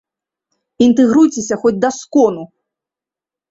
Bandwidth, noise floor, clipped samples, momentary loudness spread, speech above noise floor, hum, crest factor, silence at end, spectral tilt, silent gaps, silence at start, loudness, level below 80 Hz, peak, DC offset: 8 kHz; -88 dBFS; under 0.1%; 6 LU; 75 dB; none; 16 dB; 1.05 s; -5 dB/octave; none; 0.8 s; -13 LUFS; -56 dBFS; 0 dBFS; under 0.1%